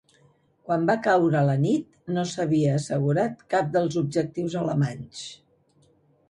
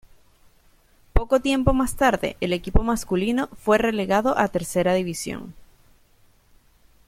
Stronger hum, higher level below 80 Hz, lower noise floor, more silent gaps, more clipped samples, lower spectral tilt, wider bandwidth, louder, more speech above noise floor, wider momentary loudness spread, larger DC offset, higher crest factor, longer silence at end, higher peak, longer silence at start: neither; second, -64 dBFS vs -32 dBFS; first, -62 dBFS vs -57 dBFS; neither; neither; first, -7 dB/octave vs -5.5 dB/octave; second, 11 kHz vs 16 kHz; about the same, -24 LUFS vs -23 LUFS; about the same, 38 dB vs 36 dB; about the same, 8 LU vs 8 LU; neither; second, 16 dB vs 22 dB; second, 0.95 s vs 1.45 s; second, -8 dBFS vs -2 dBFS; second, 0.65 s vs 1.15 s